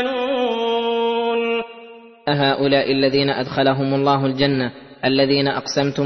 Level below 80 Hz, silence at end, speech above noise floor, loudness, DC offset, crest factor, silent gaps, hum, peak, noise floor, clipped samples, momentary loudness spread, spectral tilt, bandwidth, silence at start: -56 dBFS; 0 s; 23 dB; -19 LUFS; under 0.1%; 16 dB; none; none; -4 dBFS; -41 dBFS; under 0.1%; 7 LU; -6 dB/octave; 6.4 kHz; 0 s